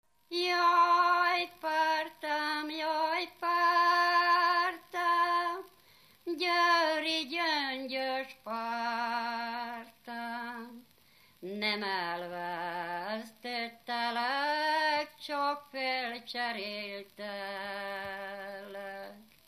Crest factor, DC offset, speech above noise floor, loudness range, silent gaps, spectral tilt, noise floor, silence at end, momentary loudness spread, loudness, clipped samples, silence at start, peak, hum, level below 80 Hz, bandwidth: 18 dB; under 0.1%; 28 dB; 9 LU; none; -2.5 dB/octave; -64 dBFS; 0.25 s; 16 LU; -31 LUFS; under 0.1%; 0.3 s; -14 dBFS; none; -82 dBFS; 15 kHz